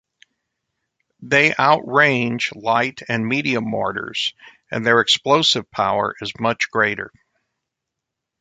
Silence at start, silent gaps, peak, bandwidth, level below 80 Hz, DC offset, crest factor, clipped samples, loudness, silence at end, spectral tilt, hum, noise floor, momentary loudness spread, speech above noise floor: 1.2 s; none; -2 dBFS; 9.4 kHz; -60 dBFS; under 0.1%; 20 dB; under 0.1%; -18 LUFS; 1.35 s; -4 dB/octave; none; -82 dBFS; 9 LU; 63 dB